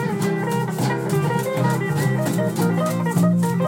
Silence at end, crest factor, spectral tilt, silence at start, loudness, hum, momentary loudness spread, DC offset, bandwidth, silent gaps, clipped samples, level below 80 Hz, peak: 0 s; 12 dB; -6.5 dB/octave; 0 s; -21 LUFS; none; 4 LU; under 0.1%; 17 kHz; none; under 0.1%; -64 dBFS; -8 dBFS